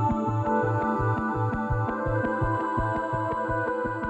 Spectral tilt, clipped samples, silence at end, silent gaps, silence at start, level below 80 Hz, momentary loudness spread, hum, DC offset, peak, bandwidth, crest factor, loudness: -9 dB/octave; under 0.1%; 0 s; none; 0 s; -42 dBFS; 3 LU; none; under 0.1%; -14 dBFS; 8.4 kHz; 12 dB; -27 LUFS